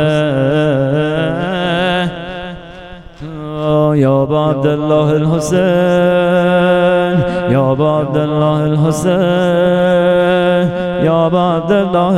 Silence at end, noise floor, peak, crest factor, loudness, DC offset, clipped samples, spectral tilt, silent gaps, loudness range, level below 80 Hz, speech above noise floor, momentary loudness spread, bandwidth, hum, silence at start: 0 s; -32 dBFS; 0 dBFS; 12 dB; -13 LUFS; under 0.1%; under 0.1%; -7 dB/octave; none; 4 LU; -40 dBFS; 21 dB; 9 LU; 13 kHz; none; 0 s